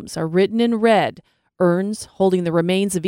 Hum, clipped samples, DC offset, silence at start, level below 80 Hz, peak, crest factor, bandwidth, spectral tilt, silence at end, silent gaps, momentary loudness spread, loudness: none; under 0.1%; under 0.1%; 0 s; -58 dBFS; -2 dBFS; 16 dB; 16.5 kHz; -6 dB/octave; 0 s; none; 6 LU; -19 LUFS